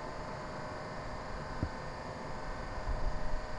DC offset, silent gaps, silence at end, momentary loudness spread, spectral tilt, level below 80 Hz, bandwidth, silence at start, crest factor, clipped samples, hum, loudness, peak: under 0.1%; none; 0 s; 3 LU; -6 dB/octave; -42 dBFS; 10.5 kHz; 0 s; 18 dB; under 0.1%; none; -42 LUFS; -20 dBFS